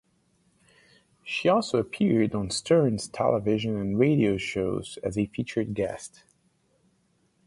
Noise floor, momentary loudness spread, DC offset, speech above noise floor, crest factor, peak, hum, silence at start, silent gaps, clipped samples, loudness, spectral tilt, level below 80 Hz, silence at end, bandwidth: -68 dBFS; 9 LU; under 0.1%; 43 dB; 18 dB; -10 dBFS; none; 1.25 s; none; under 0.1%; -26 LUFS; -6 dB/octave; -54 dBFS; 1.4 s; 11.5 kHz